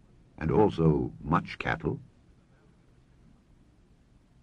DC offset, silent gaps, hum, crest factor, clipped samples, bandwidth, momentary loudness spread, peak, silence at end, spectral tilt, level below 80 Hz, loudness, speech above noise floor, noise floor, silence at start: under 0.1%; none; none; 22 dB; under 0.1%; 6.8 kHz; 11 LU; -10 dBFS; 2.4 s; -9 dB/octave; -48 dBFS; -28 LUFS; 34 dB; -61 dBFS; 0.4 s